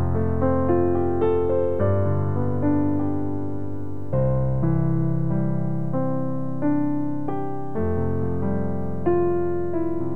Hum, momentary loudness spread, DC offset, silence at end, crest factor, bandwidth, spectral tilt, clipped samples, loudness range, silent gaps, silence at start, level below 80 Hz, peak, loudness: none; 7 LU; 5%; 0 s; 14 dB; 3.8 kHz; -12 dB/octave; under 0.1%; 3 LU; none; 0 s; -42 dBFS; -8 dBFS; -24 LUFS